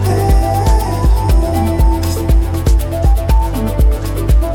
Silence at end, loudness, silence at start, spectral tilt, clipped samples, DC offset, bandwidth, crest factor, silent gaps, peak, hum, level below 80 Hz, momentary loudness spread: 0 s; -14 LUFS; 0 s; -7 dB/octave; under 0.1%; under 0.1%; 17 kHz; 8 dB; none; -2 dBFS; none; -12 dBFS; 2 LU